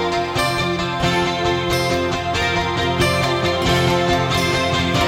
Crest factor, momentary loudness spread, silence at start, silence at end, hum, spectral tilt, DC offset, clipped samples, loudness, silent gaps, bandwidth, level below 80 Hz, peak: 14 dB; 3 LU; 0 s; 0 s; none; -4.5 dB/octave; under 0.1%; under 0.1%; -18 LUFS; none; 16 kHz; -36 dBFS; -4 dBFS